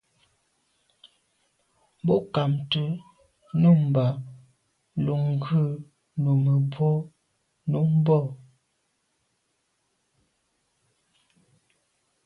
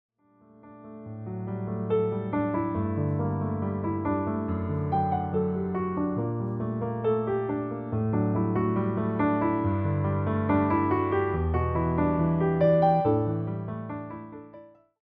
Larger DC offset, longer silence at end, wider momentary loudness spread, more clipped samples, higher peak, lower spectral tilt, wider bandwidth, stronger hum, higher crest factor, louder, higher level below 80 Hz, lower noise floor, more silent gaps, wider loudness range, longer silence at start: neither; first, 3.9 s vs 0.35 s; first, 16 LU vs 11 LU; neither; about the same, -10 dBFS vs -12 dBFS; second, -9.5 dB/octave vs -12 dB/octave; first, 4.9 kHz vs 4.2 kHz; neither; about the same, 18 dB vs 16 dB; about the same, -25 LUFS vs -27 LUFS; second, -64 dBFS vs -50 dBFS; first, -74 dBFS vs -58 dBFS; neither; about the same, 5 LU vs 4 LU; first, 2.05 s vs 0.65 s